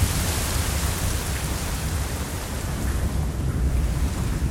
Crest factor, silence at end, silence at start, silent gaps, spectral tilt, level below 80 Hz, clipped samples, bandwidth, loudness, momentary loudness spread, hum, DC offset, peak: 14 dB; 0 s; 0 s; none; -4.5 dB/octave; -28 dBFS; under 0.1%; 17.5 kHz; -26 LUFS; 4 LU; none; under 0.1%; -10 dBFS